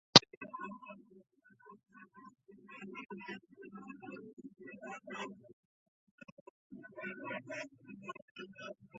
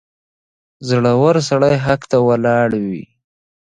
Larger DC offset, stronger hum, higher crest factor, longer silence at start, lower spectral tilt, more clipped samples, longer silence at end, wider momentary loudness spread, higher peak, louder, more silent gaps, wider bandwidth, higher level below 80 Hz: neither; neither; first, 36 dB vs 16 dB; second, 0.15 s vs 0.8 s; second, -1.5 dB/octave vs -6.5 dB/octave; neither; second, 0 s vs 0.75 s; first, 15 LU vs 11 LU; about the same, -2 dBFS vs 0 dBFS; second, -36 LUFS vs -15 LUFS; first, 0.37-0.41 s, 4.33-4.37 s, 5.53-6.18 s, 6.32-6.70 s, 8.22-8.35 s vs none; second, 7.6 kHz vs 10 kHz; second, -78 dBFS vs -50 dBFS